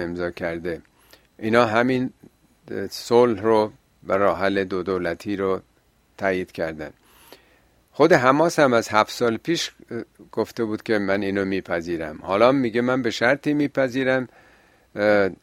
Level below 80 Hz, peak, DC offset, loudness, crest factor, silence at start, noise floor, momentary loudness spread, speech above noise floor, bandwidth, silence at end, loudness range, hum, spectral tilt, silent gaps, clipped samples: -58 dBFS; 0 dBFS; under 0.1%; -22 LUFS; 22 dB; 0 s; -59 dBFS; 14 LU; 37 dB; 16 kHz; 0.1 s; 4 LU; none; -5.5 dB/octave; none; under 0.1%